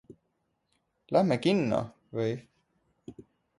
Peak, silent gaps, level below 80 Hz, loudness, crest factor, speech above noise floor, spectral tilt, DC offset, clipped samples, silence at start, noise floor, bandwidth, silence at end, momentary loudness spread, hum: -10 dBFS; none; -66 dBFS; -29 LUFS; 22 dB; 50 dB; -7 dB/octave; under 0.1%; under 0.1%; 0.1 s; -77 dBFS; 11.5 kHz; 0.4 s; 24 LU; none